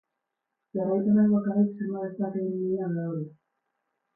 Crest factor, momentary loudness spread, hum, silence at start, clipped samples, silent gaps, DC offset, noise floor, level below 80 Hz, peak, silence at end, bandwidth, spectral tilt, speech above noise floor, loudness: 14 dB; 12 LU; none; 0.75 s; under 0.1%; none; under 0.1%; -84 dBFS; -72 dBFS; -14 dBFS; 0.85 s; 1.9 kHz; -15 dB/octave; 58 dB; -27 LUFS